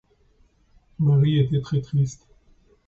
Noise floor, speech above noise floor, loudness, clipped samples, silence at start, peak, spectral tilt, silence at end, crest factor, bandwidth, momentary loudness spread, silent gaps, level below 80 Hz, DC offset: -60 dBFS; 39 dB; -22 LUFS; under 0.1%; 1 s; -10 dBFS; -8 dB/octave; 0.75 s; 14 dB; 7.4 kHz; 6 LU; none; -52 dBFS; under 0.1%